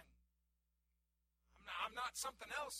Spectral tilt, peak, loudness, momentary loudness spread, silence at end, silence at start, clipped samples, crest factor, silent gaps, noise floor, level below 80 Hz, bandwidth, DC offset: 0.5 dB/octave; -30 dBFS; -46 LUFS; 7 LU; 0 s; 0 s; under 0.1%; 20 dB; none; -86 dBFS; -74 dBFS; 16 kHz; under 0.1%